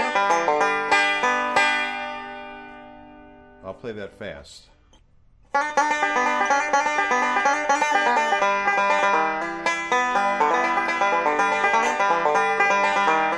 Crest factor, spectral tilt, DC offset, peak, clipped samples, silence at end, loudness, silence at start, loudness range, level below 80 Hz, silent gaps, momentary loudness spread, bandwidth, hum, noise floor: 14 dB; -2 dB/octave; under 0.1%; -8 dBFS; under 0.1%; 0 s; -20 LUFS; 0 s; 11 LU; -58 dBFS; none; 16 LU; 11 kHz; none; -55 dBFS